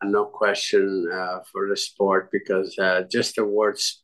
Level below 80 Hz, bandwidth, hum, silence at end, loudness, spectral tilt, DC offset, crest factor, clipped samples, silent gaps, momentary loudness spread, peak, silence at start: -70 dBFS; 12.5 kHz; none; 0.1 s; -23 LUFS; -3 dB/octave; under 0.1%; 16 dB; under 0.1%; none; 6 LU; -8 dBFS; 0 s